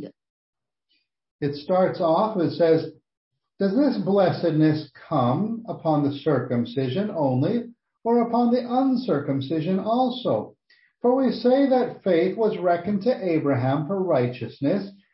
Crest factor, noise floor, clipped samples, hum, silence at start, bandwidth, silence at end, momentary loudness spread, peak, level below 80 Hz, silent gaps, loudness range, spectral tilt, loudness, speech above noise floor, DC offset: 14 dB; -72 dBFS; under 0.1%; none; 0 s; 5.8 kHz; 0.2 s; 8 LU; -8 dBFS; -68 dBFS; 0.30-0.53 s, 1.31-1.39 s, 3.17-3.31 s; 2 LU; -11.5 dB/octave; -23 LUFS; 50 dB; under 0.1%